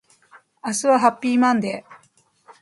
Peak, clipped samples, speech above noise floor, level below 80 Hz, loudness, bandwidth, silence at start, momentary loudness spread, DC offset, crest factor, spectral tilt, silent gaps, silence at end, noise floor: -2 dBFS; under 0.1%; 41 dB; -72 dBFS; -19 LUFS; 11.5 kHz; 0.65 s; 14 LU; under 0.1%; 20 dB; -4 dB/octave; none; 0.65 s; -60 dBFS